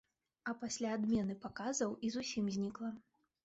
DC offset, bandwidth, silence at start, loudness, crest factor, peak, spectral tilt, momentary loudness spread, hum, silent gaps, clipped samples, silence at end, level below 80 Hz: under 0.1%; 8 kHz; 0.45 s; -40 LUFS; 14 dB; -26 dBFS; -5 dB/octave; 10 LU; none; none; under 0.1%; 0.45 s; -70 dBFS